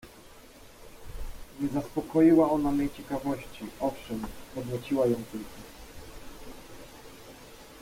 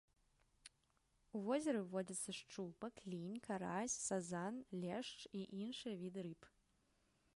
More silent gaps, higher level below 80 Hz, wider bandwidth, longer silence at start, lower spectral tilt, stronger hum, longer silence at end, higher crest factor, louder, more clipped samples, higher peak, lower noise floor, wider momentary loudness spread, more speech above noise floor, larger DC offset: neither; first, -48 dBFS vs -80 dBFS; first, 16.5 kHz vs 11.5 kHz; second, 0.05 s vs 0.65 s; first, -7 dB/octave vs -4.5 dB/octave; neither; second, 0 s vs 0.9 s; about the same, 18 dB vs 20 dB; first, -28 LUFS vs -46 LUFS; neither; first, -12 dBFS vs -28 dBFS; second, -51 dBFS vs -81 dBFS; first, 25 LU vs 11 LU; second, 23 dB vs 35 dB; neither